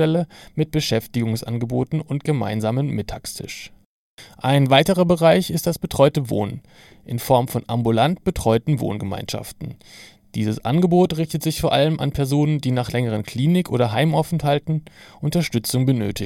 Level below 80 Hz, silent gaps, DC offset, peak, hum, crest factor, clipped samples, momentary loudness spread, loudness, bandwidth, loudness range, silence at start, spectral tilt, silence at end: -44 dBFS; 3.86-4.18 s; under 0.1%; 0 dBFS; none; 20 dB; under 0.1%; 13 LU; -20 LUFS; 17 kHz; 4 LU; 0 s; -6 dB/octave; 0 s